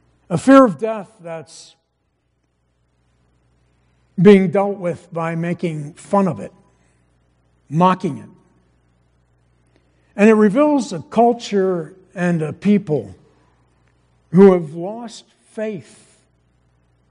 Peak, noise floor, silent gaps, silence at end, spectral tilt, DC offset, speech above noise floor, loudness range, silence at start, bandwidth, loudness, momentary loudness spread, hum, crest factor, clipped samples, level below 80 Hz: 0 dBFS; -67 dBFS; none; 1.3 s; -7.5 dB/octave; under 0.1%; 52 dB; 7 LU; 0.3 s; 10.5 kHz; -16 LUFS; 22 LU; none; 18 dB; under 0.1%; -60 dBFS